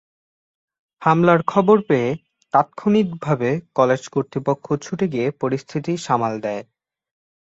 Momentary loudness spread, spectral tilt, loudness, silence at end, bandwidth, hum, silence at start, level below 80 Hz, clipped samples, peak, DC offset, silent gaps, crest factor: 10 LU; -7 dB/octave; -20 LUFS; 0.8 s; 8 kHz; none; 1 s; -60 dBFS; under 0.1%; -2 dBFS; under 0.1%; none; 18 dB